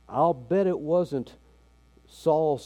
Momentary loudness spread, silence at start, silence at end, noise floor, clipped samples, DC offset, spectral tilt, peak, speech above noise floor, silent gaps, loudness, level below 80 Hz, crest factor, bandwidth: 9 LU; 0.1 s; 0 s; -58 dBFS; under 0.1%; under 0.1%; -8 dB/octave; -10 dBFS; 33 dB; none; -26 LUFS; -58 dBFS; 16 dB; 12.5 kHz